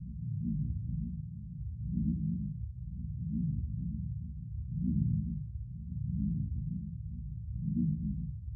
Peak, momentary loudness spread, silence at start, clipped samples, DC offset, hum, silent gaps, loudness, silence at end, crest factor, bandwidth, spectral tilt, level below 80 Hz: -18 dBFS; 10 LU; 0 s; under 0.1%; under 0.1%; none; none; -37 LUFS; 0 s; 16 dB; 0.4 kHz; -21.5 dB/octave; -44 dBFS